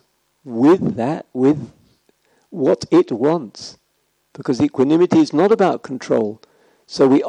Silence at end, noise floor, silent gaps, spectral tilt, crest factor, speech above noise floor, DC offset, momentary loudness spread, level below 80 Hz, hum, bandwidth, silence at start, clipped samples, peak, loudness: 0 s; -66 dBFS; none; -7 dB/octave; 16 dB; 50 dB; under 0.1%; 17 LU; -60 dBFS; none; 9.8 kHz; 0.45 s; under 0.1%; -2 dBFS; -17 LUFS